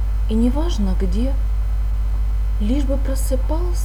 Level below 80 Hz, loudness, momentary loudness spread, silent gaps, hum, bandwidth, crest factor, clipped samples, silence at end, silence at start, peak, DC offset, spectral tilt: -18 dBFS; -21 LUFS; 4 LU; none; 50 Hz at -20 dBFS; 13 kHz; 10 dB; under 0.1%; 0 s; 0 s; -6 dBFS; under 0.1%; -7 dB/octave